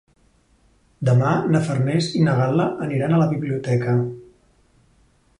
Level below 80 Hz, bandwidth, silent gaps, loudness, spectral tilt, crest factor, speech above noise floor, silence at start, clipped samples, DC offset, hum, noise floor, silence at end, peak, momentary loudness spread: -56 dBFS; 11 kHz; none; -20 LUFS; -7.5 dB/octave; 16 dB; 39 dB; 1 s; under 0.1%; under 0.1%; none; -58 dBFS; 1.15 s; -6 dBFS; 6 LU